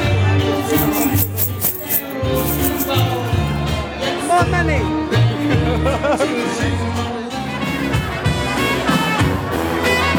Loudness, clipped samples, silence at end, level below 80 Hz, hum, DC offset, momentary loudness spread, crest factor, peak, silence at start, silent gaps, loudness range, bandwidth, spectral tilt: -18 LUFS; under 0.1%; 0 s; -32 dBFS; none; under 0.1%; 5 LU; 16 dB; -2 dBFS; 0 s; none; 2 LU; over 20 kHz; -5 dB/octave